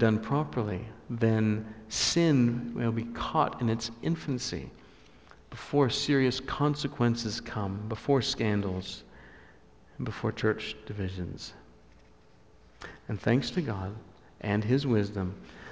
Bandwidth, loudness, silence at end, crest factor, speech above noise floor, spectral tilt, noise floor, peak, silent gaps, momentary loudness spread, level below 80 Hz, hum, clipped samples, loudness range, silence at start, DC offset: 8 kHz; -30 LUFS; 0 s; 18 dB; 30 dB; -5.5 dB/octave; -59 dBFS; -12 dBFS; none; 14 LU; -52 dBFS; none; under 0.1%; 8 LU; 0 s; under 0.1%